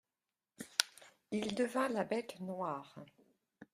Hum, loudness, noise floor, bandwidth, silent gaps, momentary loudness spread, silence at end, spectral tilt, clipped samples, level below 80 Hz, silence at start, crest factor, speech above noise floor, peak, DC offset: none; -38 LUFS; under -90 dBFS; 15.5 kHz; none; 15 LU; 0.1 s; -3 dB/octave; under 0.1%; -82 dBFS; 0.6 s; 32 dB; over 52 dB; -8 dBFS; under 0.1%